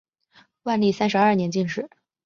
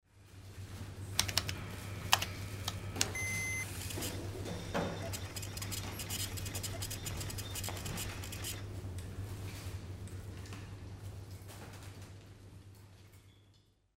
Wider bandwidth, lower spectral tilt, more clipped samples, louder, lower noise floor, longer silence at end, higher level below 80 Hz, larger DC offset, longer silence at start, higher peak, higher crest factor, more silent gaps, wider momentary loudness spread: second, 7.2 kHz vs 16 kHz; first, -6 dB/octave vs -3 dB/octave; neither; first, -22 LUFS vs -39 LUFS; second, -58 dBFS vs -67 dBFS; about the same, 0.4 s vs 0.4 s; second, -64 dBFS vs -54 dBFS; neither; first, 0.65 s vs 0.15 s; about the same, -6 dBFS vs -6 dBFS; second, 18 dB vs 36 dB; neither; second, 14 LU vs 19 LU